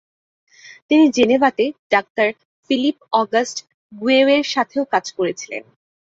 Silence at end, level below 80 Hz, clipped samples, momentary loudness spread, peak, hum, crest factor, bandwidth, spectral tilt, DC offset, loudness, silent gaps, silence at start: 0.5 s; -64 dBFS; under 0.1%; 12 LU; -2 dBFS; none; 16 dB; 7.8 kHz; -3.5 dB/octave; under 0.1%; -18 LUFS; 0.82-0.89 s, 1.79-1.90 s, 2.10-2.15 s, 2.45-2.63 s, 3.74-3.90 s; 0.65 s